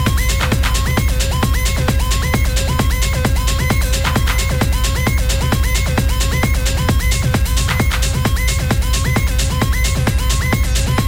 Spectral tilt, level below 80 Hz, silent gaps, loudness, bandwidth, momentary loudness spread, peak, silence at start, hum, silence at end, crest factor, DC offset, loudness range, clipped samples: -4.5 dB/octave; -18 dBFS; none; -16 LUFS; 17 kHz; 1 LU; -6 dBFS; 0 s; none; 0 s; 8 dB; under 0.1%; 0 LU; under 0.1%